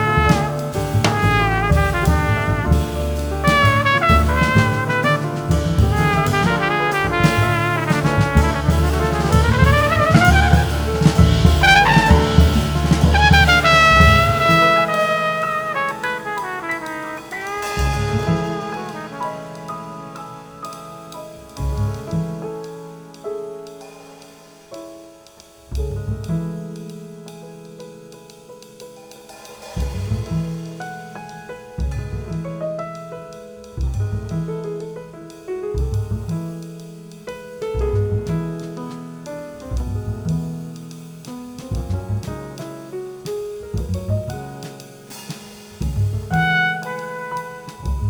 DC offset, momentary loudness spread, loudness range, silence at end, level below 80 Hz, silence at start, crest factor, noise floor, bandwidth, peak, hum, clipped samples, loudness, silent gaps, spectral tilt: under 0.1%; 22 LU; 16 LU; 0 s; -26 dBFS; 0 s; 18 dB; -45 dBFS; over 20 kHz; 0 dBFS; none; under 0.1%; -18 LUFS; none; -5.5 dB/octave